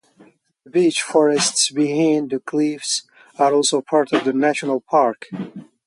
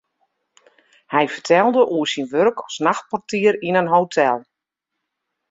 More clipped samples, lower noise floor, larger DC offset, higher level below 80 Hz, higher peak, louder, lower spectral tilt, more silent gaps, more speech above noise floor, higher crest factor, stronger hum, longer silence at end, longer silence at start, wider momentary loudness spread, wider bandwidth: neither; second, -52 dBFS vs -81 dBFS; neither; about the same, -70 dBFS vs -66 dBFS; about the same, -4 dBFS vs -2 dBFS; about the same, -18 LUFS vs -19 LUFS; second, -3 dB/octave vs -5 dB/octave; neither; second, 34 dB vs 63 dB; about the same, 16 dB vs 18 dB; neither; second, 0.25 s vs 1.1 s; second, 0.75 s vs 1.1 s; about the same, 7 LU vs 6 LU; first, 11.5 kHz vs 7.8 kHz